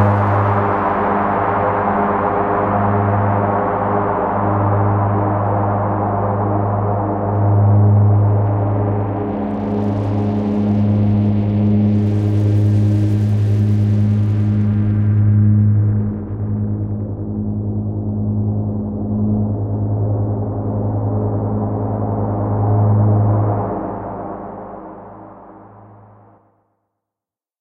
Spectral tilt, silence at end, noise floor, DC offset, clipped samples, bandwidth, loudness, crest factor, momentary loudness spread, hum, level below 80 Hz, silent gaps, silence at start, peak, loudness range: -11 dB/octave; 1.65 s; -88 dBFS; under 0.1%; under 0.1%; 3.5 kHz; -17 LUFS; 14 dB; 8 LU; none; -38 dBFS; none; 0 s; -2 dBFS; 5 LU